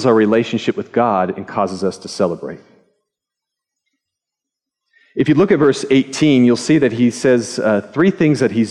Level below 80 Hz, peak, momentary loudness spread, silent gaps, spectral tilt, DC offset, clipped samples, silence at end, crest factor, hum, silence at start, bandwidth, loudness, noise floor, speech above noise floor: -58 dBFS; -2 dBFS; 8 LU; none; -6 dB/octave; under 0.1%; under 0.1%; 0 s; 14 dB; none; 0 s; 11.5 kHz; -15 LUFS; -83 dBFS; 68 dB